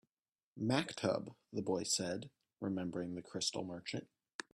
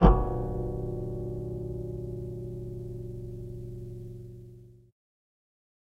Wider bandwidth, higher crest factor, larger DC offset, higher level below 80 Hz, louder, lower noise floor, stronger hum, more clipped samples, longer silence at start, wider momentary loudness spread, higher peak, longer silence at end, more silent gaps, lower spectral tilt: first, 13.5 kHz vs 4.9 kHz; about the same, 24 dB vs 26 dB; neither; second, -76 dBFS vs -34 dBFS; second, -40 LUFS vs -35 LUFS; first, under -90 dBFS vs -51 dBFS; neither; neither; first, 0.55 s vs 0 s; about the same, 11 LU vs 12 LU; second, -16 dBFS vs -4 dBFS; second, 0.1 s vs 1.25 s; first, 4.34-4.39 s vs none; second, -4 dB/octave vs -10 dB/octave